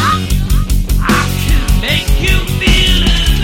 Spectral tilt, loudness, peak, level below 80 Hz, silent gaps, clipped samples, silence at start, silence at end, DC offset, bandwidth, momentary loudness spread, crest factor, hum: -4 dB/octave; -12 LUFS; 0 dBFS; -14 dBFS; none; under 0.1%; 0 s; 0 s; under 0.1%; 17 kHz; 5 LU; 10 dB; none